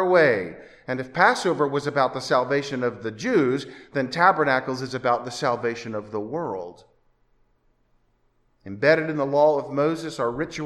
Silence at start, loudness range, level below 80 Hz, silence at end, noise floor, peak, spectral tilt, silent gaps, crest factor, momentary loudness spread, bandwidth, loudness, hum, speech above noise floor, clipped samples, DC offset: 0 s; 7 LU; -62 dBFS; 0 s; -65 dBFS; -2 dBFS; -5.5 dB/octave; none; 22 dB; 12 LU; 12.5 kHz; -23 LUFS; none; 42 dB; under 0.1%; under 0.1%